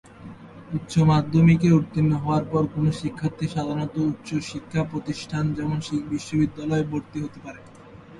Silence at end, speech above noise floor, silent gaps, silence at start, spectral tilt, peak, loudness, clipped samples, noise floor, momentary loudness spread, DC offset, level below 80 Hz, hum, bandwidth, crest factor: 0 s; 22 dB; none; 0.1 s; -7.5 dB/octave; -6 dBFS; -24 LUFS; under 0.1%; -45 dBFS; 16 LU; under 0.1%; -50 dBFS; none; 11.5 kHz; 18 dB